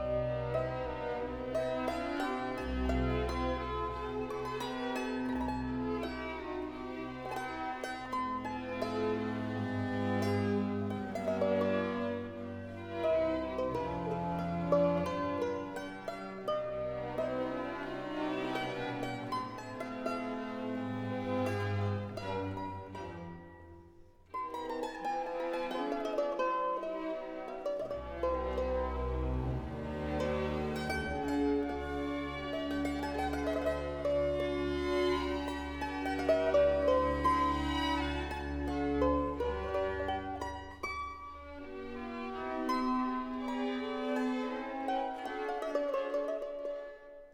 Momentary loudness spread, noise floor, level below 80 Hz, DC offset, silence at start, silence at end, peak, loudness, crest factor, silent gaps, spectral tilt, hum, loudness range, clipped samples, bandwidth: 10 LU; -58 dBFS; -48 dBFS; under 0.1%; 0 s; 0.05 s; -16 dBFS; -35 LUFS; 18 dB; none; -6.5 dB/octave; none; 6 LU; under 0.1%; 18 kHz